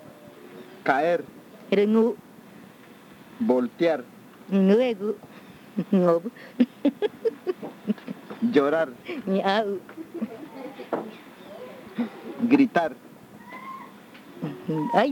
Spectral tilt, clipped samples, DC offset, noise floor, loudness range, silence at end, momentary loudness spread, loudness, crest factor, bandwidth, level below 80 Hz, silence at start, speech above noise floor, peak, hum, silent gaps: -7.5 dB/octave; under 0.1%; under 0.1%; -49 dBFS; 3 LU; 0 s; 23 LU; -25 LUFS; 20 dB; 19 kHz; -76 dBFS; 0.05 s; 25 dB; -6 dBFS; none; none